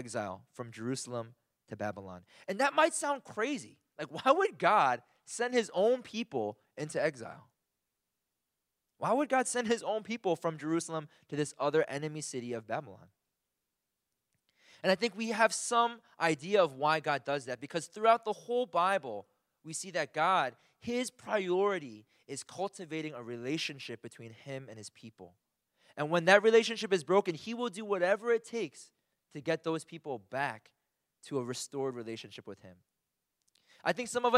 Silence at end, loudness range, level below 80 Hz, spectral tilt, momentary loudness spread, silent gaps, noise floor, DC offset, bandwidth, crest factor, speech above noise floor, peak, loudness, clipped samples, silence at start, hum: 0 s; 10 LU; -82 dBFS; -4 dB/octave; 17 LU; none; -87 dBFS; under 0.1%; 15 kHz; 26 dB; 54 dB; -8 dBFS; -32 LUFS; under 0.1%; 0 s; none